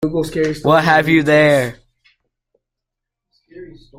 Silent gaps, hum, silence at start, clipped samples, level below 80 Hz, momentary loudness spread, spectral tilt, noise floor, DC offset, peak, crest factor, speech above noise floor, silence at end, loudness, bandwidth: none; none; 0 s; under 0.1%; -46 dBFS; 8 LU; -6 dB/octave; -81 dBFS; under 0.1%; -2 dBFS; 16 dB; 68 dB; 0.35 s; -14 LUFS; 16 kHz